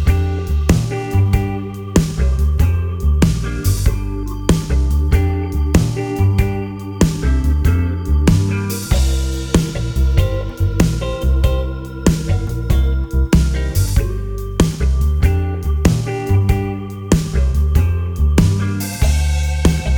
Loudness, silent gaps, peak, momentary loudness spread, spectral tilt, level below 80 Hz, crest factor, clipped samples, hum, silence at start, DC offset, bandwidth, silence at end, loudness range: -17 LUFS; none; 0 dBFS; 5 LU; -6.5 dB/octave; -18 dBFS; 14 dB; under 0.1%; none; 0 s; under 0.1%; 19 kHz; 0 s; 1 LU